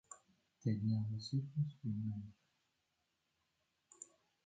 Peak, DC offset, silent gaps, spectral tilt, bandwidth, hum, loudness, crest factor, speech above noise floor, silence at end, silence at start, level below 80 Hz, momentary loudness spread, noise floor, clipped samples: -26 dBFS; under 0.1%; none; -7 dB/octave; 9 kHz; none; -41 LUFS; 18 dB; 45 dB; 0.4 s; 0.1 s; -74 dBFS; 19 LU; -85 dBFS; under 0.1%